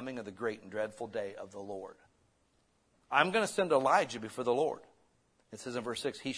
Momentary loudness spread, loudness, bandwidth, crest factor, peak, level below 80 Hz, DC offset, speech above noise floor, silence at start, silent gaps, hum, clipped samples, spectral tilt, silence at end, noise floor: 17 LU; -33 LUFS; 11 kHz; 24 dB; -10 dBFS; -76 dBFS; under 0.1%; 39 dB; 0 s; none; none; under 0.1%; -4 dB/octave; 0 s; -73 dBFS